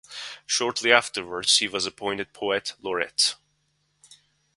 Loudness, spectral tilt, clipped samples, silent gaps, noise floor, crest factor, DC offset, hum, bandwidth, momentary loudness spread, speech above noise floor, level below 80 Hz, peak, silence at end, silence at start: -23 LUFS; -0.5 dB/octave; under 0.1%; none; -71 dBFS; 26 dB; under 0.1%; none; 11.5 kHz; 11 LU; 46 dB; -66 dBFS; 0 dBFS; 1.2 s; 0.1 s